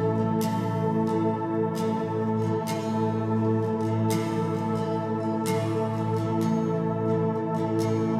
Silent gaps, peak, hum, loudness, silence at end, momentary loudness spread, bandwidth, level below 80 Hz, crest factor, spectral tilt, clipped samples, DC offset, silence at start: none; -14 dBFS; none; -26 LUFS; 0 s; 2 LU; 14.5 kHz; -62 dBFS; 12 dB; -7.5 dB/octave; under 0.1%; under 0.1%; 0 s